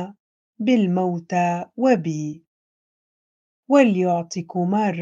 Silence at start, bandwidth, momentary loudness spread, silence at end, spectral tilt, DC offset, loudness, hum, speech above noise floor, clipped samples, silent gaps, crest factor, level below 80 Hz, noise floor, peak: 0 s; 7.8 kHz; 12 LU; 0 s; -7 dB/octave; under 0.1%; -21 LUFS; none; over 70 dB; under 0.1%; 0.20-0.53 s, 2.47-3.63 s; 20 dB; -74 dBFS; under -90 dBFS; -2 dBFS